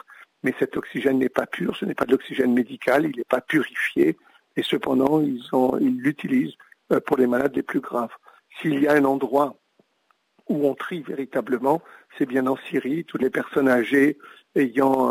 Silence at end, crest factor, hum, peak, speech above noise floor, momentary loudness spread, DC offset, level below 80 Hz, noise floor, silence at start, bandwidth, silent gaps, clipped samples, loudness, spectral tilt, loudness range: 0 s; 16 dB; none; -6 dBFS; 45 dB; 9 LU; under 0.1%; -66 dBFS; -67 dBFS; 0.45 s; 16 kHz; none; under 0.1%; -23 LUFS; -6.5 dB/octave; 3 LU